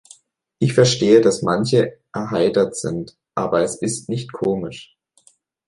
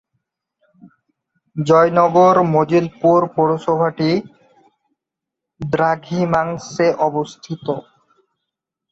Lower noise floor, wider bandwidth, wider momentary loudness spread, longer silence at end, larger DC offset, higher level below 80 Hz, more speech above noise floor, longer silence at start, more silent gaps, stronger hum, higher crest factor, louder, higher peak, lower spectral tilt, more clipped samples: second, -57 dBFS vs -83 dBFS; first, 11.5 kHz vs 7.8 kHz; about the same, 14 LU vs 13 LU; second, 0.85 s vs 1.1 s; neither; about the same, -54 dBFS vs -56 dBFS; second, 39 dB vs 67 dB; second, 0.6 s vs 1.55 s; neither; neither; about the same, 18 dB vs 16 dB; about the same, -19 LUFS vs -17 LUFS; about the same, -2 dBFS vs -2 dBFS; second, -5.5 dB/octave vs -7 dB/octave; neither